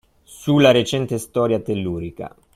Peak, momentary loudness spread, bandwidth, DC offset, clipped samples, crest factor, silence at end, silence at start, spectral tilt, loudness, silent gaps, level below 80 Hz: -2 dBFS; 16 LU; 15.5 kHz; under 0.1%; under 0.1%; 18 dB; 0.25 s; 0.3 s; -6 dB/octave; -19 LUFS; none; -50 dBFS